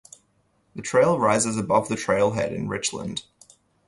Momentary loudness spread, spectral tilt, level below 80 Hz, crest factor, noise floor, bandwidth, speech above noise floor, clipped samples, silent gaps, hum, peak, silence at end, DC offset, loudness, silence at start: 14 LU; -4.5 dB/octave; -56 dBFS; 18 dB; -66 dBFS; 11.5 kHz; 44 dB; under 0.1%; none; none; -6 dBFS; 0.65 s; under 0.1%; -23 LUFS; 0.75 s